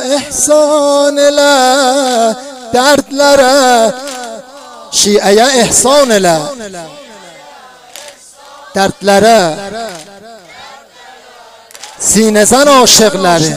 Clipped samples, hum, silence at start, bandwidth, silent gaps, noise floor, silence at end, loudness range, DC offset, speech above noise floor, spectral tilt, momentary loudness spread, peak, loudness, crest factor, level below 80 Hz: 0.3%; none; 0 s; 16.5 kHz; none; -36 dBFS; 0 s; 6 LU; under 0.1%; 28 dB; -2.5 dB/octave; 19 LU; 0 dBFS; -8 LUFS; 10 dB; -44 dBFS